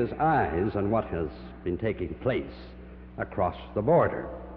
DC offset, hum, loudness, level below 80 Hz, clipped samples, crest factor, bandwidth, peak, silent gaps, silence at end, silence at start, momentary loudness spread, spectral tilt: under 0.1%; none; -28 LUFS; -46 dBFS; under 0.1%; 16 dB; 5.4 kHz; -12 dBFS; none; 0 s; 0 s; 17 LU; -10.5 dB/octave